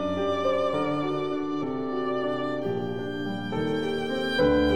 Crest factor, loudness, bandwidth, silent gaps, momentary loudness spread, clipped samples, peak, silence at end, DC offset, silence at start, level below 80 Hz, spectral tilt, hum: 16 dB; -28 LUFS; 15 kHz; none; 6 LU; under 0.1%; -12 dBFS; 0 s; 0.7%; 0 s; -50 dBFS; -6.5 dB/octave; none